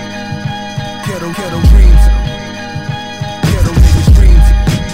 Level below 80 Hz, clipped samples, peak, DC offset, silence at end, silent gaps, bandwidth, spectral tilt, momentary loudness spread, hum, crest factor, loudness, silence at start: -10 dBFS; 1%; 0 dBFS; 1%; 0 s; none; 13.5 kHz; -6 dB/octave; 14 LU; none; 10 dB; -12 LUFS; 0 s